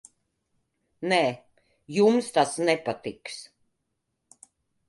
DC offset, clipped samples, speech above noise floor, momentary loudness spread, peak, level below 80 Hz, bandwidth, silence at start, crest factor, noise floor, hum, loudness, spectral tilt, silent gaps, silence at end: under 0.1%; under 0.1%; 55 dB; 17 LU; -8 dBFS; -72 dBFS; 11.5 kHz; 1 s; 20 dB; -79 dBFS; none; -25 LUFS; -4.5 dB/octave; none; 1.45 s